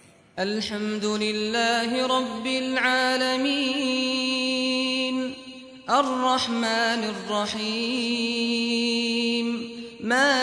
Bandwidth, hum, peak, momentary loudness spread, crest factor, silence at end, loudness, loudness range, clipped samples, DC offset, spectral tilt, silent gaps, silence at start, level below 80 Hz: 11 kHz; none; -8 dBFS; 8 LU; 16 dB; 0 s; -24 LUFS; 2 LU; under 0.1%; under 0.1%; -3 dB/octave; none; 0.35 s; -64 dBFS